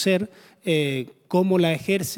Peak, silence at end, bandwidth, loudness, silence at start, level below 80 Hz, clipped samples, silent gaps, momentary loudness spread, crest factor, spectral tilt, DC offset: -8 dBFS; 0 s; 18.5 kHz; -23 LUFS; 0 s; -64 dBFS; under 0.1%; none; 11 LU; 16 dB; -5.5 dB/octave; under 0.1%